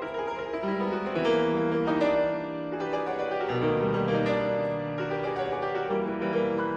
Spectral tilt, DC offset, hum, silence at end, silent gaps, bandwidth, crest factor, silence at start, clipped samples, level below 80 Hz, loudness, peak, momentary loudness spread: -7.5 dB/octave; under 0.1%; none; 0 s; none; 7.8 kHz; 14 dB; 0 s; under 0.1%; -58 dBFS; -28 LUFS; -14 dBFS; 6 LU